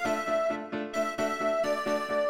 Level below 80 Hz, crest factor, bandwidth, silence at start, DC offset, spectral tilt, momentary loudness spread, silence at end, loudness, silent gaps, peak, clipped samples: -66 dBFS; 12 dB; 16.5 kHz; 0 s; under 0.1%; -4 dB/octave; 4 LU; 0 s; -30 LUFS; none; -16 dBFS; under 0.1%